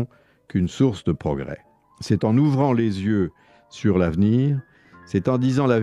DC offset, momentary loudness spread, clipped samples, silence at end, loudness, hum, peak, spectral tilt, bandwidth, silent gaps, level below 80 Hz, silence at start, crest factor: under 0.1%; 10 LU; under 0.1%; 0 s; -22 LUFS; none; -6 dBFS; -8 dB/octave; 10.5 kHz; none; -48 dBFS; 0 s; 16 dB